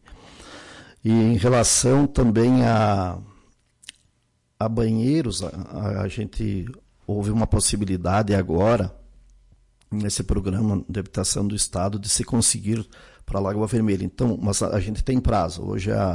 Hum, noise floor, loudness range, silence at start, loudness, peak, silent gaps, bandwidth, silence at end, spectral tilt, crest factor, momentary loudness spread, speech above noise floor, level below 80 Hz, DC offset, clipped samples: none; -68 dBFS; 6 LU; 0.1 s; -22 LUFS; -8 dBFS; none; 11.5 kHz; 0 s; -5 dB/octave; 16 dB; 12 LU; 46 dB; -38 dBFS; under 0.1%; under 0.1%